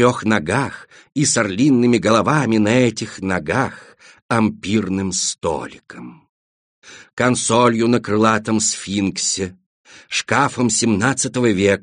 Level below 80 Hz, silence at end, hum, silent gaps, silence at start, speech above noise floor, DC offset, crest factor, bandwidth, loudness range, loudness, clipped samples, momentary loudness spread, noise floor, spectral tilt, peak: -54 dBFS; 0.05 s; none; 4.22-4.29 s, 6.29-6.82 s, 7.13-7.17 s, 9.66-9.84 s; 0 s; over 72 dB; under 0.1%; 18 dB; 10 kHz; 5 LU; -18 LUFS; under 0.1%; 11 LU; under -90 dBFS; -4 dB/octave; 0 dBFS